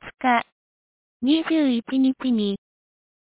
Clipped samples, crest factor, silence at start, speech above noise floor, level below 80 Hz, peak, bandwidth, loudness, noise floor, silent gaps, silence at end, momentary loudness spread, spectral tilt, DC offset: under 0.1%; 16 dB; 0.05 s; over 69 dB; -64 dBFS; -8 dBFS; 4 kHz; -22 LUFS; under -90 dBFS; 0.52-1.20 s; 0.65 s; 8 LU; -3.5 dB/octave; under 0.1%